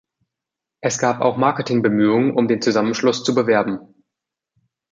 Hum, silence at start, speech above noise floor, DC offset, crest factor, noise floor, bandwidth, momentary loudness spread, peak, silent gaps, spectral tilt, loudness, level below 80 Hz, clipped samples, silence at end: none; 0.85 s; 68 dB; under 0.1%; 18 dB; -85 dBFS; 9.2 kHz; 7 LU; -2 dBFS; none; -5 dB/octave; -18 LUFS; -64 dBFS; under 0.1%; 1.1 s